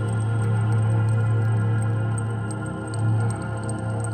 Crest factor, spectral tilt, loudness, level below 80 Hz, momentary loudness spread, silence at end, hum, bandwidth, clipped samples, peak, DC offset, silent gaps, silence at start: 10 dB; -7.5 dB/octave; -24 LUFS; -46 dBFS; 7 LU; 0 s; none; 9 kHz; under 0.1%; -12 dBFS; under 0.1%; none; 0 s